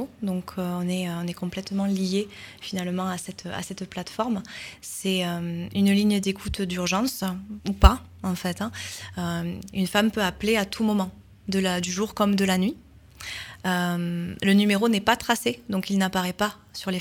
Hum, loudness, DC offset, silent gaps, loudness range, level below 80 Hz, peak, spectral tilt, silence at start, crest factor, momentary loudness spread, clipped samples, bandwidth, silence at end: none; -26 LUFS; under 0.1%; none; 6 LU; -34 dBFS; -2 dBFS; -5 dB/octave; 0 s; 24 dB; 13 LU; under 0.1%; 18.5 kHz; 0 s